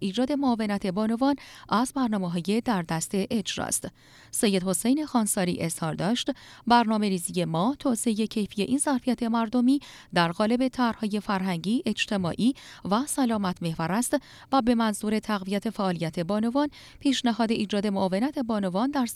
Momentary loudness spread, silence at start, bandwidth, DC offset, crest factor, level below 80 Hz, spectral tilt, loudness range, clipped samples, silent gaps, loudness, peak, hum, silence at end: 5 LU; 0 s; 15.5 kHz; under 0.1%; 18 dB; -58 dBFS; -4.5 dB/octave; 2 LU; under 0.1%; none; -26 LUFS; -8 dBFS; none; 0 s